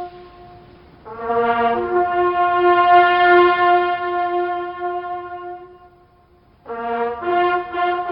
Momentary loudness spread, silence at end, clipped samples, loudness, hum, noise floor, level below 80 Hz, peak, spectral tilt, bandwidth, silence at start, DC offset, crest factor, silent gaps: 19 LU; 0 s; under 0.1%; -17 LUFS; none; -53 dBFS; -54 dBFS; -2 dBFS; -9 dB/octave; 5.4 kHz; 0 s; under 0.1%; 18 dB; none